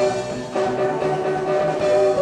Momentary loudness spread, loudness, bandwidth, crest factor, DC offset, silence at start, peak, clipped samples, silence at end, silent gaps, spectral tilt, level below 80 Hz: 6 LU; -21 LUFS; 10.5 kHz; 12 dB; under 0.1%; 0 s; -8 dBFS; under 0.1%; 0 s; none; -5.5 dB/octave; -52 dBFS